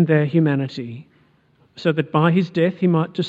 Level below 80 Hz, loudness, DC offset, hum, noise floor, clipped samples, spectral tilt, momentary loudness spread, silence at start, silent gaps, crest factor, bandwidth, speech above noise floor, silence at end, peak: -66 dBFS; -19 LUFS; under 0.1%; none; -58 dBFS; under 0.1%; -8.5 dB/octave; 14 LU; 0 s; none; 18 dB; 7.2 kHz; 39 dB; 0 s; -2 dBFS